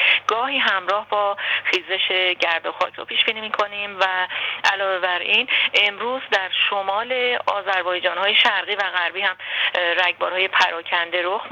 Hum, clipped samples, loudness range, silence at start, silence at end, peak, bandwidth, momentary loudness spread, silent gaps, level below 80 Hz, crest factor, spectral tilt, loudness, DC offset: none; under 0.1%; 2 LU; 0 s; 0 s; -4 dBFS; 18 kHz; 6 LU; none; -74 dBFS; 18 dB; -1.5 dB/octave; -19 LUFS; under 0.1%